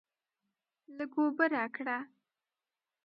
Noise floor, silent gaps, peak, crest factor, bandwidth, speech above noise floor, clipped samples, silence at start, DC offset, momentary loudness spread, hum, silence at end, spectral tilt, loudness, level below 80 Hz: under -90 dBFS; none; -14 dBFS; 22 dB; 5.6 kHz; over 57 dB; under 0.1%; 0.9 s; under 0.1%; 18 LU; none; 1 s; -7.5 dB/octave; -33 LUFS; under -90 dBFS